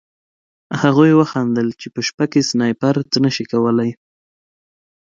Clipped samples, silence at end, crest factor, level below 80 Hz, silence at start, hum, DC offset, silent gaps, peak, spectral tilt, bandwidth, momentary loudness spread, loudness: under 0.1%; 1.1 s; 18 dB; -62 dBFS; 0.7 s; none; under 0.1%; 2.14-2.18 s; 0 dBFS; -5.5 dB/octave; 7.6 kHz; 11 LU; -16 LUFS